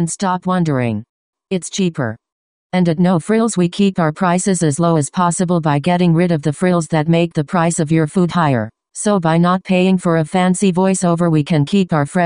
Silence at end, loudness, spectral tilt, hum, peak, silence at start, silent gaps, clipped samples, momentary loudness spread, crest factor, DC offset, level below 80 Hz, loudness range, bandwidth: 0 s; -16 LUFS; -6 dB/octave; none; 0 dBFS; 0 s; 1.09-1.33 s, 2.32-2.70 s; under 0.1%; 6 LU; 14 dB; under 0.1%; -52 dBFS; 3 LU; 10.5 kHz